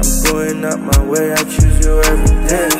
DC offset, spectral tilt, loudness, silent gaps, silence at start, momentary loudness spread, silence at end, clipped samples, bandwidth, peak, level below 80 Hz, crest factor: under 0.1%; -4.5 dB/octave; -14 LUFS; none; 0 s; 4 LU; 0 s; under 0.1%; 16.5 kHz; 0 dBFS; -14 dBFS; 12 dB